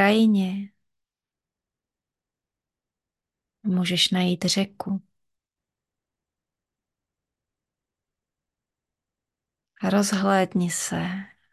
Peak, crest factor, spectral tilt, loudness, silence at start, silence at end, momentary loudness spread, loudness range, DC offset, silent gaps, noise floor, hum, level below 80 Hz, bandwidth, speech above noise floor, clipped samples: -6 dBFS; 22 dB; -4.5 dB/octave; -23 LUFS; 0 s; 0.25 s; 12 LU; 11 LU; under 0.1%; none; under -90 dBFS; none; -66 dBFS; 12.5 kHz; over 67 dB; under 0.1%